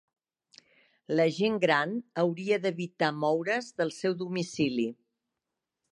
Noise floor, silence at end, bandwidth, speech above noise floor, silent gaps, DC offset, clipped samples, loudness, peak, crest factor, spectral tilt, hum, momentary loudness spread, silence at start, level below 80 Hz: -87 dBFS; 1 s; 11.5 kHz; 58 dB; none; under 0.1%; under 0.1%; -29 LUFS; -10 dBFS; 22 dB; -5.5 dB/octave; none; 7 LU; 1.1 s; -74 dBFS